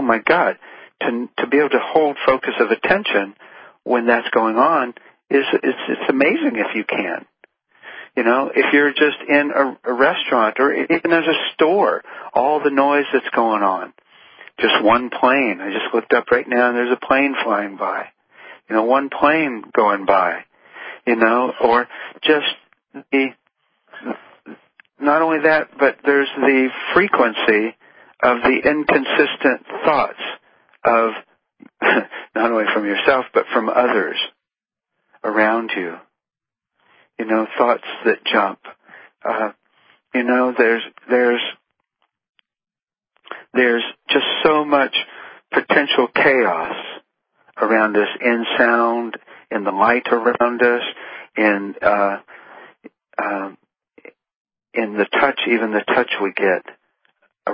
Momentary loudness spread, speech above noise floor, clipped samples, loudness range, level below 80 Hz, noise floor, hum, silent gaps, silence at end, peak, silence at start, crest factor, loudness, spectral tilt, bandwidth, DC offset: 12 LU; 72 dB; under 0.1%; 5 LU; -60 dBFS; -89 dBFS; none; 42.29-42.33 s, 54.36-54.45 s; 0 s; 0 dBFS; 0 s; 18 dB; -17 LUFS; -9 dB/octave; 5.2 kHz; under 0.1%